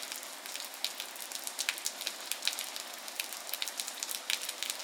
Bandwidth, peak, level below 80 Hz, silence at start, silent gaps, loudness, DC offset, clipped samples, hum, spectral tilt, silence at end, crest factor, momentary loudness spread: 19 kHz; -8 dBFS; under -90 dBFS; 0 s; none; -36 LUFS; under 0.1%; under 0.1%; none; 3 dB/octave; 0 s; 32 dB; 6 LU